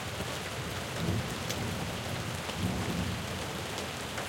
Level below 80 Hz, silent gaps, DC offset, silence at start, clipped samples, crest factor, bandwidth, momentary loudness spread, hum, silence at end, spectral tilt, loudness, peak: -50 dBFS; none; under 0.1%; 0 s; under 0.1%; 18 dB; 17 kHz; 3 LU; none; 0 s; -4 dB/octave; -35 LUFS; -16 dBFS